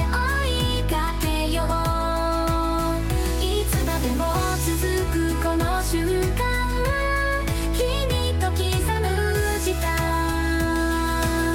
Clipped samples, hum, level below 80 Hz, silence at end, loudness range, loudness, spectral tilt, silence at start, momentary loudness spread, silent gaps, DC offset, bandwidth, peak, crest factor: under 0.1%; none; -26 dBFS; 0 s; 0 LU; -23 LUFS; -5 dB/octave; 0 s; 1 LU; none; under 0.1%; 17 kHz; -10 dBFS; 12 dB